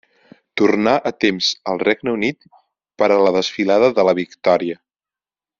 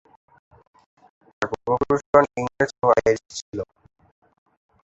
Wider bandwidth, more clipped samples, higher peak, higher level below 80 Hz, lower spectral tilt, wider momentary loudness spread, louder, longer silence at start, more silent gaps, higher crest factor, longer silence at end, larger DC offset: about the same, 7.6 kHz vs 8.2 kHz; neither; about the same, -2 dBFS vs -2 dBFS; second, -60 dBFS vs -52 dBFS; second, -3 dB/octave vs -5.5 dB/octave; second, 7 LU vs 15 LU; first, -17 LUFS vs -22 LUFS; second, 0.55 s vs 1.4 s; second, none vs 2.06-2.13 s, 3.42-3.52 s; second, 16 dB vs 22 dB; second, 0.85 s vs 1.25 s; neither